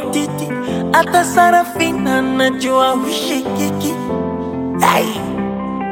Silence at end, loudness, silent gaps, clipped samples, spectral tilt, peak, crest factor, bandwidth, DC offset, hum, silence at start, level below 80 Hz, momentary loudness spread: 0 s; -16 LUFS; none; under 0.1%; -4.5 dB/octave; 0 dBFS; 16 dB; 17 kHz; under 0.1%; none; 0 s; -48 dBFS; 9 LU